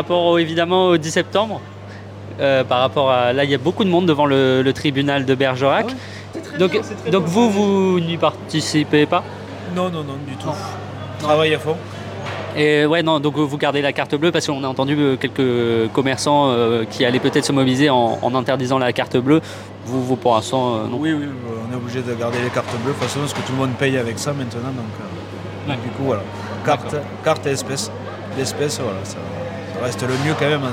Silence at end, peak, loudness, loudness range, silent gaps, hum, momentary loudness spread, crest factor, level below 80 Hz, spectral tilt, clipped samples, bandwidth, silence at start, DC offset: 0 s; -4 dBFS; -19 LUFS; 6 LU; none; none; 12 LU; 16 dB; -58 dBFS; -5.5 dB/octave; under 0.1%; 16.5 kHz; 0 s; under 0.1%